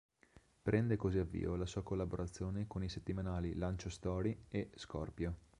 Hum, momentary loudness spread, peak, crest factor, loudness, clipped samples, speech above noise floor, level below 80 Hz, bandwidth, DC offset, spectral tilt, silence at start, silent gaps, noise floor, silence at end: none; 8 LU; -18 dBFS; 22 dB; -41 LUFS; under 0.1%; 28 dB; -52 dBFS; 10.5 kHz; under 0.1%; -7 dB/octave; 0.35 s; none; -68 dBFS; 0.25 s